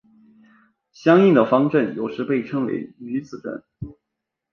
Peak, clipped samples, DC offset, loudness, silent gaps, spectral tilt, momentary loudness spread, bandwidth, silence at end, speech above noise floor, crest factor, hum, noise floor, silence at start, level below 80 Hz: -2 dBFS; under 0.1%; under 0.1%; -20 LUFS; none; -8.5 dB/octave; 20 LU; 6.8 kHz; 0.6 s; 62 dB; 18 dB; none; -82 dBFS; 1 s; -56 dBFS